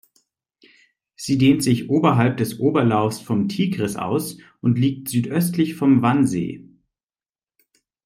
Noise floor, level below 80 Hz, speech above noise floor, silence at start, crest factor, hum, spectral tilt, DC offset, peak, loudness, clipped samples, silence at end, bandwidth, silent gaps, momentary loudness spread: under -90 dBFS; -60 dBFS; over 71 dB; 1.2 s; 18 dB; none; -6.5 dB/octave; under 0.1%; -2 dBFS; -20 LUFS; under 0.1%; 1.45 s; 16 kHz; none; 9 LU